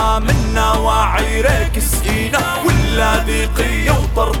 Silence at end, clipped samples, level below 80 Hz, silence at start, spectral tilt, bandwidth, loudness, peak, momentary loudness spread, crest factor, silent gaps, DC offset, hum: 0 s; under 0.1%; -18 dBFS; 0 s; -4.5 dB/octave; 17.5 kHz; -15 LUFS; 0 dBFS; 3 LU; 14 dB; none; under 0.1%; none